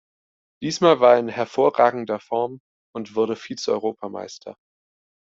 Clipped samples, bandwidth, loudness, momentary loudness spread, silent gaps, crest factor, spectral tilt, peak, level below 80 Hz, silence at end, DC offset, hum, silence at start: under 0.1%; 7.8 kHz; -21 LUFS; 19 LU; 2.60-2.93 s; 20 dB; -5 dB/octave; -2 dBFS; -68 dBFS; 0.85 s; under 0.1%; none; 0.6 s